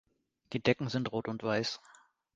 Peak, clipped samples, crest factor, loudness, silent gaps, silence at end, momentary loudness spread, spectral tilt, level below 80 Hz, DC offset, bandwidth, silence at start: -12 dBFS; under 0.1%; 24 dB; -34 LUFS; none; 0.6 s; 9 LU; -5.5 dB/octave; -66 dBFS; under 0.1%; 9.2 kHz; 0.5 s